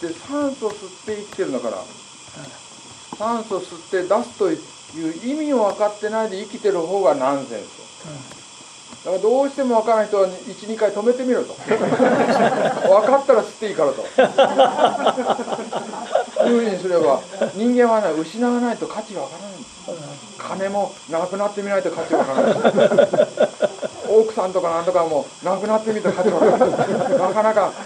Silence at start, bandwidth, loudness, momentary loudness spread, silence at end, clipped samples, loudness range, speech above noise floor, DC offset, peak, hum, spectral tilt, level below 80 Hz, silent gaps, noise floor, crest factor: 0 s; 10.5 kHz; -19 LUFS; 18 LU; 0 s; under 0.1%; 8 LU; 22 dB; under 0.1%; 0 dBFS; none; -5 dB/octave; -68 dBFS; none; -41 dBFS; 18 dB